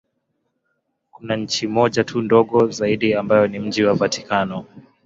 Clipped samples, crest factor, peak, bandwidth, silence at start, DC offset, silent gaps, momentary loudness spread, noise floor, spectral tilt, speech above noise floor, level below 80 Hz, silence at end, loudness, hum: under 0.1%; 18 dB; -2 dBFS; 7.8 kHz; 1.2 s; under 0.1%; none; 8 LU; -72 dBFS; -5 dB/octave; 53 dB; -56 dBFS; 0.25 s; -19 LUFS; none